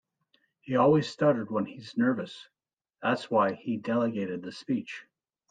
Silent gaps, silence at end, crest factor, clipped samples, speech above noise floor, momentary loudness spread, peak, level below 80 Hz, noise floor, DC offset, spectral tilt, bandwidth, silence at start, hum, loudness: 2.73-2.77 s; 0.5 s; 18 dB; under 0.1%; 44 dB; 14 LU; -12 dBFS; -74 dBFS; -72 dBFS; under 0.1%; -7 dB/octave; 9.2 kHz; 0.65 s; none; -28 LUFS